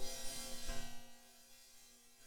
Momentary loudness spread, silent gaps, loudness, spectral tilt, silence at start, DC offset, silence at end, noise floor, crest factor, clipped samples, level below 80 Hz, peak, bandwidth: 16 LU; none; -48 LUFS; -1.5 dB/octave; 0 s; under 0.1%; 0 s; -63 dBFS; 14 dB; under 0.1%; -52 dBFS; -28 dBFS; 19.5 kHz